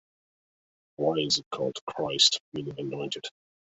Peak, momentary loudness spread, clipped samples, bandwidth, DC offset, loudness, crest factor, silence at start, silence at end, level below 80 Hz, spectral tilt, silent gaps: -8 dBFS; 14 LU; under 0.1%; 8.4 kHz; under 0.1%; -27 LUFS; 24 dB; 1 s; 0.5 s; -70 dBFS; -2.5 dB/octave; 1.46-1.51 s, 1.81-1.87 s, 2.40-2.52 s